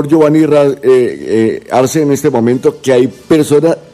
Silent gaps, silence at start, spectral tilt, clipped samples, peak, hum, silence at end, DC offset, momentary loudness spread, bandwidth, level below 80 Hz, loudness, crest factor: none; 0 s; -6.5 dB/octave; 0.2%; 0 dBFS; none; 0.15 s; under 0.1%; 5 LU; 15 kHz; -50 dBFS; -10 LUFS; 10 dB